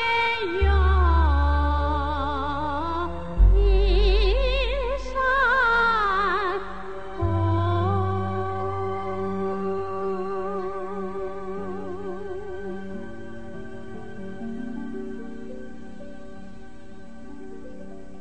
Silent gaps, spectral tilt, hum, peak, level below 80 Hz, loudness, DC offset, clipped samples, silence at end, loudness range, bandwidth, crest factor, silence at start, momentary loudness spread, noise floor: none; -7.5 dB/octave; none; -6 dBFS; -28 dBFS; -25 LUFS; 2%; under 0.1%; 0 s; 15 LU; 8.2 kHz; 18 dB; 0 s; 21 LU; -45 dBFS